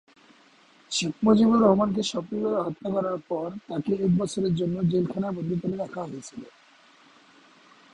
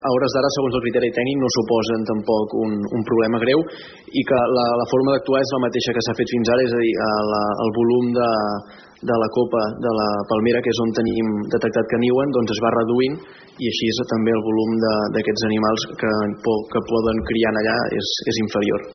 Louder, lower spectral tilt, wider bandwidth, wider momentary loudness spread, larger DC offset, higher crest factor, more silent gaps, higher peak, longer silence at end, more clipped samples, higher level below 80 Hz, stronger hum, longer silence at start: second, -25 LUFS vs -20 LUFS; first, -6.5 dB/octave vs -4.5 dB/octave; first, 10.5 kHz vs 6.4 kHz; first, 13 LU vs 4 LU; neither; first, 20 dB vs 14 dB; neither; about the same, -6 dBFS vs -6 dBFS; first, 1.45 s vs 0 s; neither; second, -60 dBFS vs -50 dBFS; neither; first, 0.9 s vs 0 s